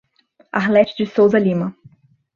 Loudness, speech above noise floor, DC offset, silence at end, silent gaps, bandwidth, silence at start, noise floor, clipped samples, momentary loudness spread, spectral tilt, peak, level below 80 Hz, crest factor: -17 LUFS; 41 dB; under 0.1%; 0.65 s; none; 7 kHz; 0.55 s; -57 dBFS; under 0.1%; 10 LU; -8 dB/octave; -2 dBFS; -60 dBFS; 16 dB